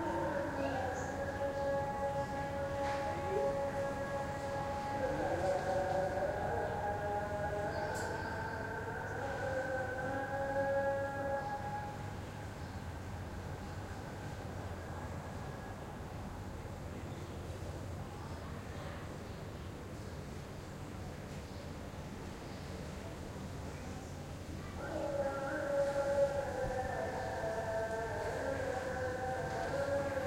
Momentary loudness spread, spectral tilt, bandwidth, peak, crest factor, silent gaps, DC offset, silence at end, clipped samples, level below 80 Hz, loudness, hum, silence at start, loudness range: 11 LU; -6 dB/octave; 16.5 kHz; -22 dBFS; 18 dB; none; under 0.1%; 0 s; under 0.1%; -54 dBFS; -39 LUFS; none; 0 s; 9 LU